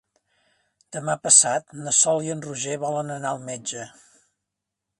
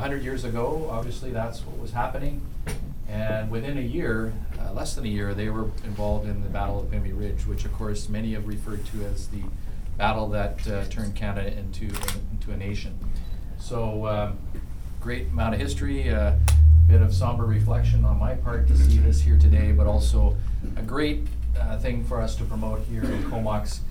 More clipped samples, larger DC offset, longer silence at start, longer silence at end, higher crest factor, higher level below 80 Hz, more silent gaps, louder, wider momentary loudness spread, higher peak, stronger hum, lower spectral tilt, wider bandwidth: neither; second, under 0.1% vs 1%; first, 0.9 s vs 0 s; first, 1.1 s vs 0 s; first, 26 dB vs 16 dB; second, -72 dBFS vs -24 dBFS; neither; first, -21 LUFS vs -25 LUFS; about the same, 18 LU vs 16 LU; first, 0 dBFS vs -6 dBFS; first, 50 Hz at -55 dBFS vs none; second, -2 dB/octave vs -7 dB/octave; second, 11.5 kHz vs 17.5 kHz